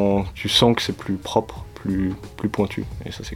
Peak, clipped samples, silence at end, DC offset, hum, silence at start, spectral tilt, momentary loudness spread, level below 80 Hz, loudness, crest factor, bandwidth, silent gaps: -2 dBFS; under 0.1%; 0 s; under 0.1%; none; 0 s; -5 dB/octave; 15 LU; -40 dBFS; -22 LUFS; 20 dB; 16.5 kHz; none